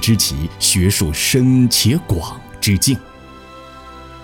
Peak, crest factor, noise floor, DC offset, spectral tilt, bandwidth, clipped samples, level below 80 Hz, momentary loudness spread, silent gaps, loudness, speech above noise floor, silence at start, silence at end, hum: -2 dBFS; 14 dB; -38 dBFS; under 0.1%; -4 dB/octave; 17.5 kHz; under 0.1%; -34 dBFS; 22 LU; none; -15 LUFS; 23 dB; 0 s; 0 s; none